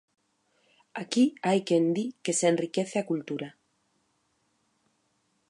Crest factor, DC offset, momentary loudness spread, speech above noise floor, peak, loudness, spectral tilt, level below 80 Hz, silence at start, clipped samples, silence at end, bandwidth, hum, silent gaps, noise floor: 20 dB; under 0.1%; 13 LU; 46 dB; -10 dBFS; -27 LUFS; -4.5 dB/octave; -82 dBFS; 0.95 s; under 0.1%; 2 s; 11.5 kHz; none; none; -73 dBFS